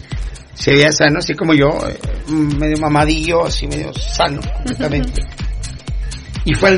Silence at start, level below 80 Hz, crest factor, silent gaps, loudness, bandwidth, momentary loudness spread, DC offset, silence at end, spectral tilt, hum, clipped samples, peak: 0 s; -24 dBFS; 16 dB; none; -16 LUFS; 11 kHz; 15 LU; under 0.1%; 0 s; -5 dB/octave; none; under 0.1%; 0 dBFS